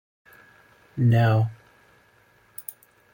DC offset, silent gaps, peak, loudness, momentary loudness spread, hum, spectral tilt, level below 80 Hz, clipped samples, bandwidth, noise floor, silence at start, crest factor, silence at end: under 0.1%; none; -10 dBFS; -22 LUFS; 20 LU; none; -8 dB/octave; -60 dBFS; under 0.1%; 17 kHz; -59 dBFS; 0.95 s; 16 dB; 0.5 s